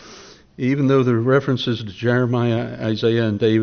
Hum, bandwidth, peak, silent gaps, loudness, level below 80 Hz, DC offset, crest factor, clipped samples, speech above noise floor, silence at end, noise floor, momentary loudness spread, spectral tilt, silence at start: none; 6.6 kHz; -4 dBFS; none; -19 LUFS; -56 dBFS; under 0.1%; 14 dB; under 0.1%; 25 dB; 0 s; -43 dBFS; 7 LU; -6 dB/octave; 0.05 s